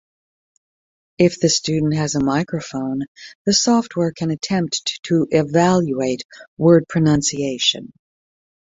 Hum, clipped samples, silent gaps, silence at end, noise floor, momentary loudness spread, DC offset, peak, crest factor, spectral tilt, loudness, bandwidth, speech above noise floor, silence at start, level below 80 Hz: none; under 0.1%; 3.08-3.15 s, 3.35-3.45 s, 4.99-5.03 s, 6.25-6.29 s, 6.48-6.57 s; 0.75 s; under -90 dBFS; 10 LU; under 0.1%; -2 dBFS; 18 dB; -4.5 dB/octave; -18 LUFS; 8 kHz; over 72 dB; 1.2 s; -52 dBFS